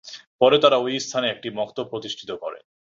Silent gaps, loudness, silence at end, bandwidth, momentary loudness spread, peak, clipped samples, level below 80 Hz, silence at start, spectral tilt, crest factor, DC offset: 0.27-0.39 s; -22 LUFS; 0.35 s; 7.8 kHz; 16 LU; -2 dBFS; under 0.1%; -66 dBFS; 0.05 s; -3.5 dB/octave; 20 dB; under 0.1%